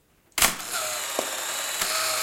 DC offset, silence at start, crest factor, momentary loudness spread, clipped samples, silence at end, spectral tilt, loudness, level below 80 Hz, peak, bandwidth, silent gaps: under 0.1%; 0.35 s; 24 dB; 6 LU; under 0.1%; 0 s; 0.5 dB/octave; -25 LUFS; -52 dBFS; -2 dBFS; 17 kHz; none